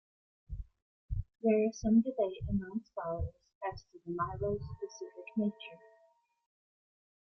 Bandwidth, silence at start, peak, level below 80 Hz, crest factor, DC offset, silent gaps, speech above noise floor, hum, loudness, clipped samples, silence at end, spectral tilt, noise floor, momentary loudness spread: 6.6 kHz; 0.5 s; -18 dBFS; -52 dBFS; 18 dB; under 0.1%; 0.82-1.08 s, 3.55-3.61 s; 36 dB; none; -35 LUFS; under 0.1%; 1.55 s; -7.5 dB/octave; -70 dBFS; 20 LU